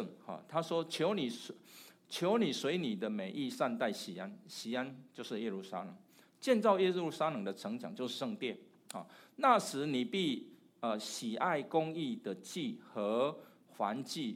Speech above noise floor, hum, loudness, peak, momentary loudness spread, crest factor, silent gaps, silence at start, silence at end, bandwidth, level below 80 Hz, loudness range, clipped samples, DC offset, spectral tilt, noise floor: 23 dB; none; -36 LUFS; -14 dBFS; 16 LU; 22 dB; none; 0 s; 0 s; 16 kHz; under -90 dBFS; 3 LU; under 0.1%; under 0.1%; -4.5 dB/octave; -59 dBFS